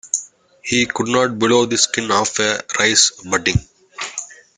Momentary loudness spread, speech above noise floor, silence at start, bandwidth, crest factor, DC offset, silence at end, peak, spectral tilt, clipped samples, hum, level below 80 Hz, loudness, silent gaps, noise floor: 13 LU; 20 dB; 0.05 s; 10.5 kHz; 18 dB; under 0.1%; 0.25 s; 0 dBFS; -2.5 dB/octave; under 0.1%; none; -44 dBFS; -16 LUFS; none; -37 dBFS